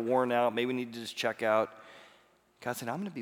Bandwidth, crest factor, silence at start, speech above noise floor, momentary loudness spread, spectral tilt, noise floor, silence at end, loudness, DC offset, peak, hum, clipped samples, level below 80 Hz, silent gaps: 19.5 kHz; 18 dB; 0 s; 33 dB; 12 LU; -4.5 dB/octave; -65 dBFS; 0 s; -32 LUFS; under 0.1%; -14 dBFS; none; under 0.1%; -82 dBFS; none